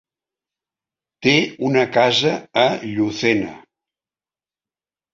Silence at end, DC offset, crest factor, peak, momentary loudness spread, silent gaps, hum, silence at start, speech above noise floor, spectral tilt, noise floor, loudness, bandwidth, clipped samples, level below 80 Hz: 1.55 s; under 0.1%; 20 dB; -2 dBFS; 7 LU; none; none; 1.2 s; over 72 dB; -4.5 dB/octave; under -90 dBFS; -18 LUFS; 7.8 kHz; under 0.1%; -60 dBFS